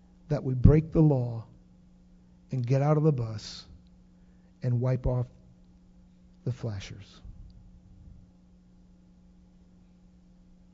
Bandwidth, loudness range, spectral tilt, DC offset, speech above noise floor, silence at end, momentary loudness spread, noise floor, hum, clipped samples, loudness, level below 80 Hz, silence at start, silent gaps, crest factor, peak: 7.6 kHz; 16 LU; -9 dB/octave; under 0.1%; 31 dB; 2.65 s; 22 LU; -57 dBFS; none; under 0.1%; -28 LUFS; -40 dBFS; 0.3 s; none; 28 dB; -2 dBFS